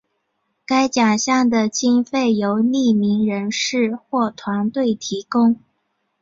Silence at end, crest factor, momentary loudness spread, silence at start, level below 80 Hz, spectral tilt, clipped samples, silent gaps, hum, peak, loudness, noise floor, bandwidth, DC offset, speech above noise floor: 0.65 s; 14 dB; 6 LU; 0.7 s; -62 dBFS; -4.5 dB/octave; under 0.1%; none; none; -4 dBFS; -19 LUFS; -71 dBFS; 7.8 kHz; under 0.1%; 53 dB